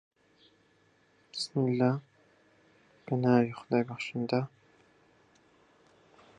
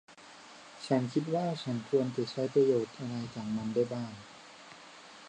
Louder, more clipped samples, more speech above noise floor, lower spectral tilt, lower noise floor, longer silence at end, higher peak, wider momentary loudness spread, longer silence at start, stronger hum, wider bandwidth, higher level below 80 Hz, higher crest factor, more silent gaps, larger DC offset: about the same, -31 LUFS vs -32 LUFS; neither; first, 38 dB vs 21 dB; about the same, -7 dB/octave vs -6.5 dB/octave; first, -67 dBFS vs -53 dBFS; first, 1.9 s vs 0 s; first, -12 dBFS vs -16 dBFS; second, 13 LU vs 22 LU; first, 1.35 s vs 0.1 s; neither; about the same, 10 kHz vs 9.8 kHz; about the same, -76 dBFS vs -74 dBFS; about the same, 22 dB vs 18 dB; neither; neither